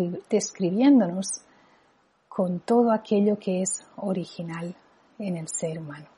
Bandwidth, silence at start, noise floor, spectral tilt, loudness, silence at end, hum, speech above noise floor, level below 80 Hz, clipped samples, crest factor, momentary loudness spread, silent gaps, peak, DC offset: 11.5 kHz; 0 s; -64 dBFS; -5.5 dB/octave; -25 LUFS; 0.1 s; none; 39 dB; -72 dBFS; under 0.1%; 16 dB; 16 LU; none; -10 dBFS; under 0.1%